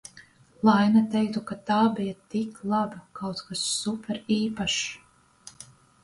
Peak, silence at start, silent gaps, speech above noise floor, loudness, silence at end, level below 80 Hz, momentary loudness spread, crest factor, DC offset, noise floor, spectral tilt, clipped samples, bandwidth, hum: -8 dBFS; 0.15 s; none; 28 dB; -26 LUFS; 0.4 s; -62 dBFS; 14 LU; 18 dB; under 0.1%; -54 dBFS; -4.5 dB/octave; under 0.1%; 11.5 kHz; none